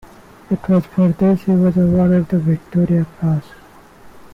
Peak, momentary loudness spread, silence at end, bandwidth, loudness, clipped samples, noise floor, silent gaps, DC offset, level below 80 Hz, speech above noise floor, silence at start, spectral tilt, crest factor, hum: -8 dBFS; 6 LU; 0.15 s; 4.3 kHz; -16 LUFS; under 0.1%; -43 dBFS; none; under 0.1%; -42 dBFS; 28 dB; 0.5 s; -10.5 dB/octave; 8 dB; none